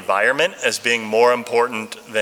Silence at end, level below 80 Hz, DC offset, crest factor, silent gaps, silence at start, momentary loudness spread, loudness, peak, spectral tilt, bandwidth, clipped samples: 0 s; -70 dBFS; under 0.1%; 16 dB; none; 0 s; 7 LU; -18 LUFS; -2 dBFS; -2 dB/octave; 17 kHz; under 0.1%